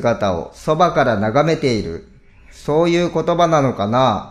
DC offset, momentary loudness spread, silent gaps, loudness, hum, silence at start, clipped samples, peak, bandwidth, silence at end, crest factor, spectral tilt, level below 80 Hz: under 0.1%; 9 LU; none; -17 LUFS; none; 0 s; under 0.1%; -2 dBFS; 13 kHz; 0 s; 16 dB; -6.5 dB/octave; -42 dBFS